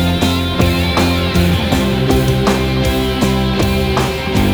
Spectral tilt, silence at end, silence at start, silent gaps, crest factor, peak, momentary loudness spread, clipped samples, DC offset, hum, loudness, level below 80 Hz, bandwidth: -5.5 dB/octave; 0 s; 0 s; none; 12 dB; 0 dBFS; 2 LU; under 0.1%; under 0.1%; none; -14 LUFS; -24 dBFS; over 20 kHz